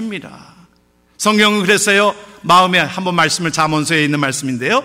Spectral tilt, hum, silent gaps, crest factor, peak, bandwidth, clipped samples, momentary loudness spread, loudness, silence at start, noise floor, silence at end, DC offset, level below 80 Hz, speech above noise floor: -3.5 dB/octave; none; none; 14 dB; -2 dBFS; 16 kHz; under 0.1%; 8 LU; -13 LUFS; 0 s; -55 dBFS; 0 s; under 0.1%; -54 dBFS; 40 dB